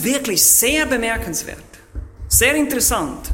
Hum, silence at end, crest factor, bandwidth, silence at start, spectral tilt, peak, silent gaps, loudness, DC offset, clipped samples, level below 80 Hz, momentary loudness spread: none; 0 s; 18 dB; 16.5 kHz; 0 s; -2 dB/octave; 0 dBFS; none; -15 LUFS; under 0.1%; under 0.1%; -34 dBFS; 22 LU